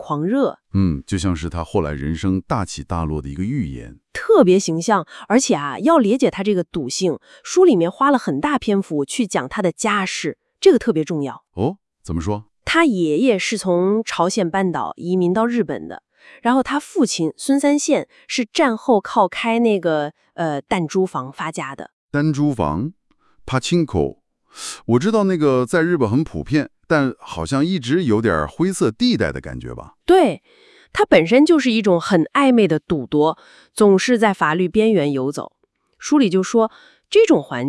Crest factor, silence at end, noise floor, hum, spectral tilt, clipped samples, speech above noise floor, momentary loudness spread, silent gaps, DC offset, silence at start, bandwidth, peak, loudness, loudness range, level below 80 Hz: 18 dB; 0 s; -46 dBFS; none; -5.5 dB/octave; under 0.1%; 29 dB; 12 LU; 21.93-22.09 s; under 0.1%; 0 s; 12 kHz; 0 dBFS; -18 LUFS; 5 LU; -46 dBFS